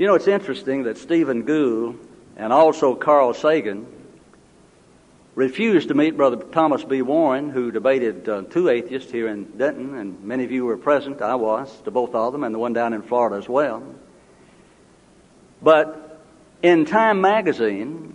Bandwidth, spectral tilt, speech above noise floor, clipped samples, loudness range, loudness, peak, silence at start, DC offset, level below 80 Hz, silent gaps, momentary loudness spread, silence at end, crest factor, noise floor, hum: 10.5 kHz; -6.5 dB/octave; 33 dB; under 0.1%; 4 LU; -20 LUFS; -2 dBFS; 0 s; under 0.1%; -64 dBFS; none; 12 LU; 0.05 s; 18 dB; -52 dBFS; none